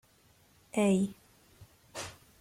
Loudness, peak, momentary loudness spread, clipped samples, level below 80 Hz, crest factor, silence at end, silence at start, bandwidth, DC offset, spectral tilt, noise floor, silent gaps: -32 LUFS; -18 dBFS; 17 LU; under 0.1%; -66 dBFS; 18 dB; 0.3 s; 0.75 s; 15.5 kHz; under 0.1%; -6 dB/octave; -65 dBFS; none